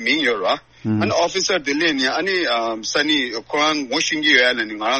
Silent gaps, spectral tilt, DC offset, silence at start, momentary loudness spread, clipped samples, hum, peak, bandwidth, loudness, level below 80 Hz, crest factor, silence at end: none; -3 dB/octave; 0.1%; 0 s; 7 LU; under 0.1%; none; 0 dBFS; 8.8 kHz; -18 LUFS; -58 dBFS; 20 dB; 0 s